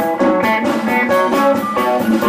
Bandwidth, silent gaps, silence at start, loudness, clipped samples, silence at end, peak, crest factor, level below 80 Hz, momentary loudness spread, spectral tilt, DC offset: 16 kHz; none; 0 s; -15 LUFS; under 0.1%; 0 s; -2 dBFS; 12 dB; -54 dBFS; 2 LU; -5.5 dB/octave; under 0.1%